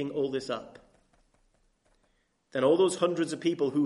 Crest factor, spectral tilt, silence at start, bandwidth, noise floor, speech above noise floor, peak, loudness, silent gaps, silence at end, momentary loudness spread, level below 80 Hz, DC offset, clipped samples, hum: 18 dB; -5 dB/octave; 0 s; 11.5 kHz; -72 dBFS; 44 dB; -12 dBFS; -28 LUFS; none; 0 s; 13 LU; -72 dBFS; under 0.1%; under 0.1%; none